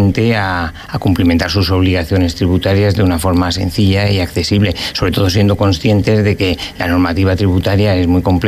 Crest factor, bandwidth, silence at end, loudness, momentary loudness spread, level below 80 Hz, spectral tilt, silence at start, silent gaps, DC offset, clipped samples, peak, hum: 10 dB; 15 kHz; 0 s; -13 LUFS; 4 LU; -30 dBFS; -6.5 dB/octave; 0 s; none; under 0.1%; under 0.1%; -2 dBFS; none